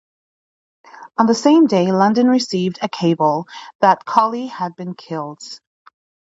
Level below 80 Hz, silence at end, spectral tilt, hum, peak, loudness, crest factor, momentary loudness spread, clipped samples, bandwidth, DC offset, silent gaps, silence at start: -68 dBFS; 0.85 s; -6 dB/octave; none; 0 dBFS; -17 LUFS; 18 dB; 18 LU; under 0.1%; 8 kHz; under 0.1%; 3.75-3.79 s; 1 s